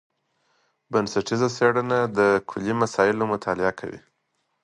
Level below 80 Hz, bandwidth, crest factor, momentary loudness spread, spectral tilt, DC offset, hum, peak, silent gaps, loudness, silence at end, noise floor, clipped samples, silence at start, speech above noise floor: -60 dBFS; 11 kHz; 20 dB; 6 LU; -5.5 dB/octave; under 0.1%; none; -4 dBFS; none; -23 LUFS; 0.65 s; -74 dBFS; under 0.1%; 0.9 s; 51 dB